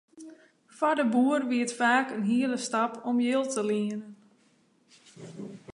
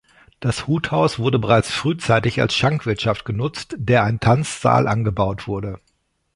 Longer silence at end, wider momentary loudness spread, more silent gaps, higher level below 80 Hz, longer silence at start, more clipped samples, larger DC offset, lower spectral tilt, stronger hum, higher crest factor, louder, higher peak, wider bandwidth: second, 0.05 s vs 0.6 s; first, 18 LU vs 10 LU; neither; second, -78 dBFS vs -42 dBFS; second, 0.15 s vs 0.4 s; neither; neither; second, -4.5 dB/octave vs -6 dB/octave; neither; about the same, 18 dB vs 18 dB; second, -27 LUFS vs -19 LUFS; second, -10 dBFS vs -2 dBFS; about the same, 11 kHz vs 11.5 kHz